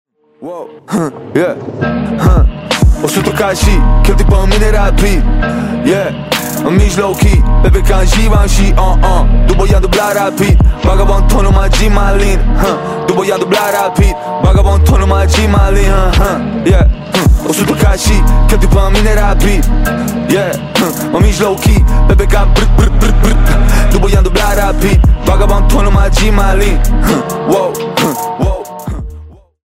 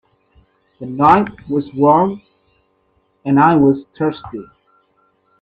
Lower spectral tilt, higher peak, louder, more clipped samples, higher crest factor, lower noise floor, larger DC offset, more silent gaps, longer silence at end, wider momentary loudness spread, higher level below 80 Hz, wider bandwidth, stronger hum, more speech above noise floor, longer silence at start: second, -5.5 dB/octave vs -9.5 dB/octave; about the same, 0 dBFS vs 0 dBFS; first, -11 LUFS vs -14 LUFS; neither; second, 8 dB vs 18 dB; second, -32 dBFS vs -61 dBFS; neither; neither; second, 0.35 s vs 0.95 s; second, 5 LU vs 20 LU; first, -10 dBFS vs -52 dBFS; first, 16.5 kHz vs 4.9 kHz; neither; second, 24 dB vs 47 dB; second, 0.4 s vs 0.8 s